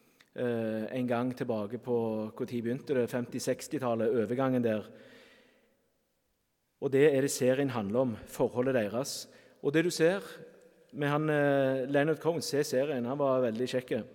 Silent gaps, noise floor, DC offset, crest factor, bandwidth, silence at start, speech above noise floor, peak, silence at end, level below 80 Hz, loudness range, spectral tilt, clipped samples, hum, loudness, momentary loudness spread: none; -77 dBFS; under 0.1%; 20 dB; 17.5 kHz; 0.35 s; 47 dB; -12 dBFS; 0 s; -72 dBFS; 4 LU; -5.5 dB/octave; under 0.1%; none; -31 LUFS; 9 LU